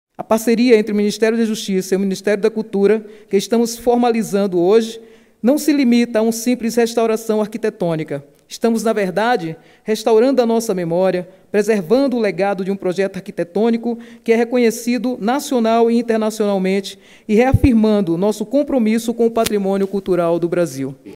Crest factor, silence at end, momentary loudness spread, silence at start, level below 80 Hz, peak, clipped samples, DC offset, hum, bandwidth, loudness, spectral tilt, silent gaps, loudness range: 16 dB; 0 s; 8 LU; 0.2 s; -42 dBFS; 0 dBFS; under 0.1%; under 0.1%; none; 16 kHz; -17 LUFS; -5.5 dB/octave; none; 2 LU